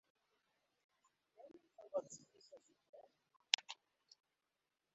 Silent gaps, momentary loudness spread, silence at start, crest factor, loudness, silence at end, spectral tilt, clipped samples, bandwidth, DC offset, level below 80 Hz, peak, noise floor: 2.89-2.93 s; 28 LU; 1.4 s; 42 dB; -41 LUFS; 1.2 s; 2.5 dB/octave; under 0.1%; 7.6 kHz; under 0.1%; under -90 dBFS; -10 dBFS; under -90 dBFS